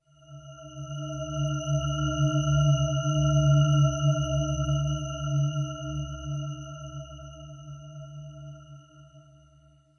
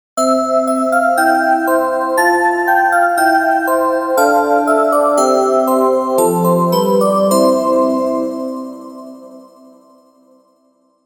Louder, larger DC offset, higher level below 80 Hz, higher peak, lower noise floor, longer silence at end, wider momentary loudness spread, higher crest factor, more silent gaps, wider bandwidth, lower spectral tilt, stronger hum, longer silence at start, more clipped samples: second, -27 LUFS vs -13 LUFS; neither; first, -44 dBFS vs -58 dBFS; second, -12 dBFS vs 0 dBFS; about the same, -59 dBFS vs -57 dBFS; second, 0.75 s vs 1.65 s; first, 21 LU vs 7 LU; about the same, 16 dB vs 14 dB; neither; second, 6.6 kHz vs 20 kHz; first, -6.5 dB/octave vs -5 dB/octave; neither; first, 0.3 s vs 0.15 s; neither